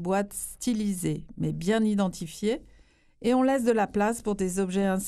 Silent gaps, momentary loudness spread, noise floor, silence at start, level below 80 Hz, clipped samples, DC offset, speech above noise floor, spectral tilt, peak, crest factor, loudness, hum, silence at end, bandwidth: none; 8 LU; -57 dBFS; 0 s; -52 dBFS; under 0.1%; under 0.1%; 31 dB; -5.5 dB/octave; -12 dBFS; 16 dB; -27 LUFS; none; 0 s; 14 kHz